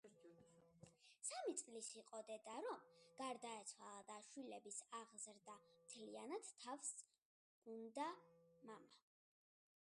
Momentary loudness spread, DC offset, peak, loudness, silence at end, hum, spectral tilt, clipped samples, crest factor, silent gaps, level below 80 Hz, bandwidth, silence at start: 17 LU; under 0.1%; -32 dBFS; -54 LUFS; 0.8 s; none; -2 dB/octave; under 0.1%; 24 dB; 7.18-7.62 s; under -90 dBFS; 11.5 kHz; 0.05 s